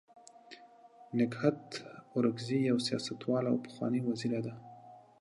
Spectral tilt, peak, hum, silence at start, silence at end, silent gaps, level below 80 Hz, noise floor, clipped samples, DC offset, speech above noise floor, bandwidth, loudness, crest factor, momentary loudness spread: -6 dB/octave; -14 dBFS; none; 0.5 s; 0.2 s; none; -78 dBFS; -57 dBFS; under 0.1%; under 0.1%; 25 dB; 11.5 kHz; -34 LUFS; 22 dB; 22 LU